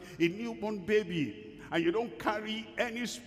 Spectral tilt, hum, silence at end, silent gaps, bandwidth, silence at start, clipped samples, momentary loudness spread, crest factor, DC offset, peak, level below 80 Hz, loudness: -5 dB/octave; none; 0 s; none; 15 kHz; 0 s; under 0.1%; 7 LU; 18 dB; under 0.1%; -16 dBFS; -64 dBFS; -33 LUFS